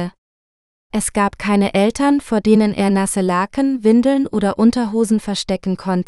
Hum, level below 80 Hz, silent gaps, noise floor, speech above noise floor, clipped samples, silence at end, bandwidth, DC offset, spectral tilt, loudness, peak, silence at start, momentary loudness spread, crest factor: none; -44 dBFS; 0.18-0.90 s; under -90 dBFS; over 74 dB; under 0.1%; 0.05 s; 13 kHz; under 0.1%; -5.5 dB/octave; -17 LUFS; 0 dBFS; 0 s; 7 LU; 16 dB